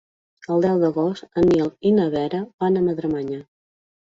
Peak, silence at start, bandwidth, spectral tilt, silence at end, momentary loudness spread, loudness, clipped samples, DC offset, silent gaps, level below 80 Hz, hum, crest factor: -6 dBFS; 0.5 s; 7.6 kHz; -8.5 dB/octave; 0.7 s; 9 LU; -21 LUFS; under 0.1%; under 0.1%; 2.54-2.58 s; -54 dBFS; none; 14 dB